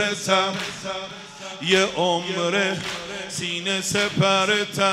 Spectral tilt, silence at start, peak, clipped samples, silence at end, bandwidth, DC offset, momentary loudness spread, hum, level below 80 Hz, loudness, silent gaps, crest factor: -3 dB/octave; 0 s; -4 dBFS; under 0.1%; 0 s; 16 kHz; under 0.1%; 11 LU; none; -60 dBFS; -22 LUFS; none; 20 dB